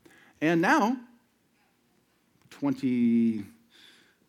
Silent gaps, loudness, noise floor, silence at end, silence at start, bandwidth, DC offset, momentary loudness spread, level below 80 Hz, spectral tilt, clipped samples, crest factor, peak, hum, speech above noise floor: none; -26 LUFS; -68 dBFS; 0.85 s; 0.4 s; 13.5 kHz; under 0.1%; 14 LU; -80 dBFS; -6 dB/octave; under 0.1%; 18 dB; -10 dBFS; none; 44 dB